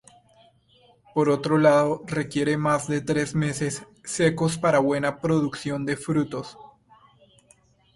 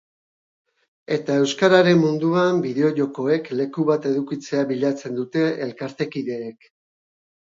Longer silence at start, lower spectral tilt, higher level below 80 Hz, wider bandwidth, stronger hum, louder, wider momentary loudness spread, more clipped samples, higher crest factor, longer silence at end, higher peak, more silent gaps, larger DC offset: about the same, 1.15 s vs 1.1 s; about the same, -6 dB/octave vs -6 dB/octave; first, -58 dBFS vs -70 dBFS; first, 11.5 kHz vs 7.8 kHz; neither; second, -24 LUFS vs -21 LUFS; about the same, 11 LU vs 12 LU; neither; about the same, 18 dB vs 20 dB; first, 1.3 s vs 1.05 s; second, -6 dBFS vs -2 dBFS; neither; neither